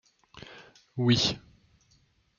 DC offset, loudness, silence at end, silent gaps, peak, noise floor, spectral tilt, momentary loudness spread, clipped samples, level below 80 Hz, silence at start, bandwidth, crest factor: under 0.1%; -26 LUFS; 1 s; none; -10 dBFS; -67 dBFS; -5 dB/octave; 24 LU; under 0.1%; -60 dBFS; 0.35 s; 7.2 kHz; 24 dB